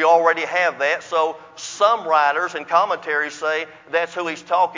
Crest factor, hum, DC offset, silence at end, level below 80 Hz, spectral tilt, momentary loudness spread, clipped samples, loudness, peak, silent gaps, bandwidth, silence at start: 18 dB; none; under 0.1%; 0 s; -74 dBFS; -2 dB/octave; 8 LU; under 0.1%; -20 LUFS; -2 dBFS; none; 7.6 kHz; 0 s